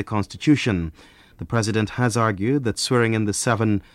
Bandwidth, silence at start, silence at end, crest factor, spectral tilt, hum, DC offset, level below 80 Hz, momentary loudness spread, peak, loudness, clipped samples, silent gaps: 14 kHz; 0 s; 0.15 s; 16 dB; -5.5 dB/octave; none; under 0.1%; -46 dBFS; 7 LU; -4 dBFS; -21 LUFS; under 0.1%; none